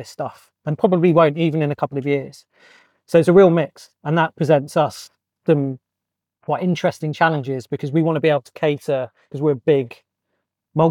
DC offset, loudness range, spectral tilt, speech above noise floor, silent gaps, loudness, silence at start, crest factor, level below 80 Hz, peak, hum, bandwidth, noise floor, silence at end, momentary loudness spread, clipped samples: under 0.1%; 4 LU; -7.5 dB/octave; 65 dB; none; -19 LUFS; 0 s; 16 dB; -64 dBFS; -4 dBFS; none; 13 kHz; -83 dBFS; 0 s; 16 LU; under 0.1%